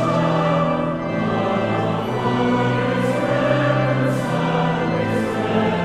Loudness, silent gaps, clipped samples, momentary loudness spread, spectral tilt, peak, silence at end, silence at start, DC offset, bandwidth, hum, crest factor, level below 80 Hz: -20 LUFS; none; under 0.1%; 3 LU; -7 dB/octave; -6 dBFS; 0 s; 0 s; under 0.1%; 13 kHz; none; 14 dB; -48 dBFS